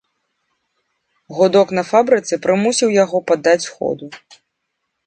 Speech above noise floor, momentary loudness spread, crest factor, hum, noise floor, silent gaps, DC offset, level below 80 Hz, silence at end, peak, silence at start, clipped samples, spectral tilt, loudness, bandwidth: 59 dB; 10 LU; 18 dB; none; -74 dBFS; none; under 0.1%; -64 dBFS; 0.9 s; 0 dBFS; 1.3 s; under 0.1%; -4 dB/octave; -16 LUFS; 9.2 kHz